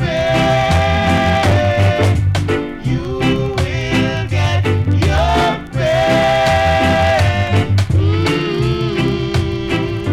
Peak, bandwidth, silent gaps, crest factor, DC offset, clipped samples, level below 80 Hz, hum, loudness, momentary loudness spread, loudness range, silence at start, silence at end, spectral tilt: -6 dBFS; 13 kHz; none; 8 dB; under 0.1%; under 0.1%; -28 dBFS; none; -15 LUFS; 6 LU; 2 LU; 0 s; 0 s; -6.5 dB/octave